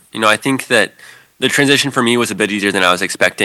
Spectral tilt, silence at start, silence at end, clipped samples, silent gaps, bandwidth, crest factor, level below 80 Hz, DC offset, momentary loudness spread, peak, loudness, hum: -3 dB/octave; 0.15 s; 0 s; under 0.1%; none; 18.5 kHz; 14 dB; -60 dBFS; under 0.1%; 4 LU; 0 dBFS; -14 LUFS; none